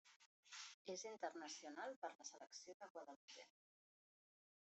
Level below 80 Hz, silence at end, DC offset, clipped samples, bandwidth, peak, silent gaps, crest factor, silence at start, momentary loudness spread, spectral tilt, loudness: under -90 dBFS; 1.2 s; under 0.1%; under 0.1%; 8.2 kHz; -36 dBFS; 0.16-0.20 s, 0.26-0.43 s, 0.74-0.85 s, 1.96-2.02 s, 2.15-2.19 s, 2.74-2.80 s, 2.90-2.95 s, 3.16-3.28 s; 22 dB; 0.05 s; 10 LU; -1.5 dB/octave; -55 LUFS